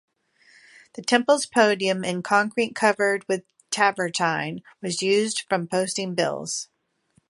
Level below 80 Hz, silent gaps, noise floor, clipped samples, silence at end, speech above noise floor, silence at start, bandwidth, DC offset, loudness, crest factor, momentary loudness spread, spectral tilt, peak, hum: -72 dBFS; none; -66 dBFS; under 0.1%; 0.65 s; 43 dB; 0.95 s; 11.5 kHz; under 0.1%; -23 LUFS; 22 dB; 11 LU; -3.5 dB/octave; -4 dBFS; none